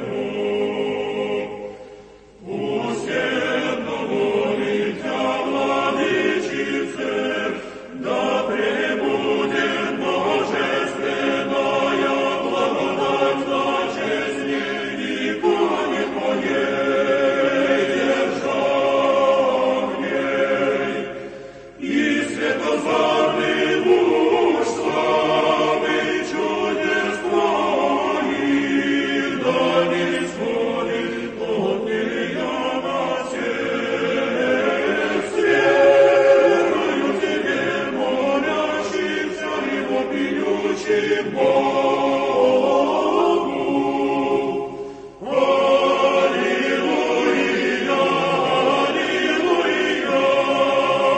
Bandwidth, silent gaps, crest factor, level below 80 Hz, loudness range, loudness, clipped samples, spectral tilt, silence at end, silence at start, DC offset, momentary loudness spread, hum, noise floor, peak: 8.8 kHz; none; 16 dB; -56 dBFS; 5 LU; -20 LUFS; under 0.1%; -4.5 dB/octave; 0 s; 0 s; under 0.1%; 7 LU; none; -44 dBFS; -4 dBFS